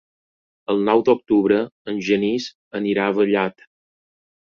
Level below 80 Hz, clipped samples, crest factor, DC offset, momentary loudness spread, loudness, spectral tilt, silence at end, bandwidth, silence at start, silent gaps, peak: -62 dBFS; under 0.1%; 18 dB; under 0.1%; 9 LU; -20 LUFS; -6 dB/octave; 1 s; 7 kHz; 0.7 s; 1.72-1.85 s, 2.55-2.71 s; -2 dBFS